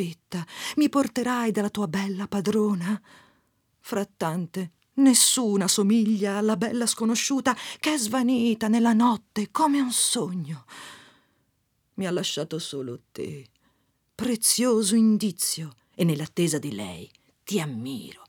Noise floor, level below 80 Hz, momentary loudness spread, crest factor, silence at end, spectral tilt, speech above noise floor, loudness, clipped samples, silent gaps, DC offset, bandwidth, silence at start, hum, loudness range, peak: -72 dBFS; -70 dBFS; 15 LU; 20 dB; 0.15 s; -4 dB/octave; 47 dB; -24 LUFS; under 0.1%; none; under 0.1%; 19 kHz; 0 s; none; 8 LU; -4 dBFS